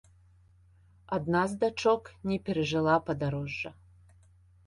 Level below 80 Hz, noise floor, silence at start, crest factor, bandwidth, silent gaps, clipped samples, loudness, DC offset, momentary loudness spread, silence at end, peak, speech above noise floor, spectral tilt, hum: -58 dBFS; -60 dBFS; 1.1 s; 20 dB; 11.5 kHz; none; under 0.1%; -30 LUFS; under 0.1%; 9 LU; 0.95 s; -12 dBFS; 31 dB; -6.5 dB/octave; none